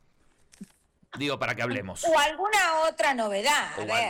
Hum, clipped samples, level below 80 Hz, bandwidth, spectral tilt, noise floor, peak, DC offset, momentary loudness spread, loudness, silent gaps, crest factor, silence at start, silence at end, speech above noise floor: none; under 0.1%; -60 dBFS; 19 kHz; -2.5 dB/octave; -63 dBFS; -16 dBFS; under 0.1%; 8 LU; -25 LUFS; none; 10 dB; 0.6 s; 0 s; 37 dB